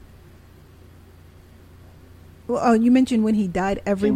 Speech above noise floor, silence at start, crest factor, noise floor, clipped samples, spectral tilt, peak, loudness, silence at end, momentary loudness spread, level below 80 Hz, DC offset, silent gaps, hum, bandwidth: 29 dB; 2.5 s; 16 dB; -47 dBFS; under 0.1%; -7 dB/octave; -6 dBFS; -20 LUFS; 0 s; 9 LU; -48 dBFS; under 0.1%; none; none; 12.5 kHz